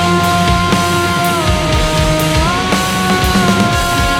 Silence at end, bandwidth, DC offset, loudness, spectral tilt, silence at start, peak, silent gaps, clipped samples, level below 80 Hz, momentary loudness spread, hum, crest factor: 0 s; 17.5 kHz; under 0.1%; -12 LUFS; -4.5 dB/octave; 0 s; 0 dBFS; none; under 0.1%; -22 dBFS; 2 LU; none; 12 dB